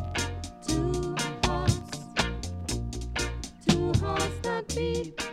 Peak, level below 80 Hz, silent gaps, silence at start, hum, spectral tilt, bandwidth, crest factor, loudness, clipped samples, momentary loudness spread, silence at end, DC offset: -8 dBFS; -38 dBFS; none; 0 s; none; -4.5 dB/octave; 16 kHz; 22 dB; -30 LUFS; under 0.1%; 7 LU; 0 s; under 0.1%